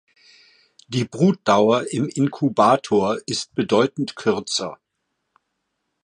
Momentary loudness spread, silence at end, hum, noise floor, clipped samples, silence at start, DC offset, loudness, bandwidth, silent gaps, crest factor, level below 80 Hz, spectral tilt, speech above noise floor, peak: 9 LU; 1.3 s; none; -76 dBFS; under 0.1%; 0.9 s; under 0.1%; -20 LUFS; 11 kHz; none; 18 dB; -62 dBFS; -5.5 dB/octave; 57 dB; -2 dBFS